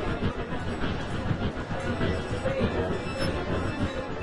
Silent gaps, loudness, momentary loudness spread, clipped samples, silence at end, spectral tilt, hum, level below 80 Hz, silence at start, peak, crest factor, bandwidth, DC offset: none; -30 LUFS; 4 LU; under 0.1%; 0 s; -6.5 dB/octave; none; -40 dBFS; 0 s; -12 dBFS; 16 dB; 11 kHz; 0.9%